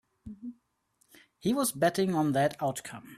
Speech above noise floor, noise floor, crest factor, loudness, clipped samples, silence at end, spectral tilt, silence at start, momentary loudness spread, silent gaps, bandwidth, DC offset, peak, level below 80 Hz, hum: 32 dB; -62 dBFS; 18 dB; -29 LUFS; under 0.1%; 0 s; -5 dB/octave; 0.25 s; 18 LU; none; 15.5 kHz; under 0.1%; -14 dBFS; -66 dBFS; none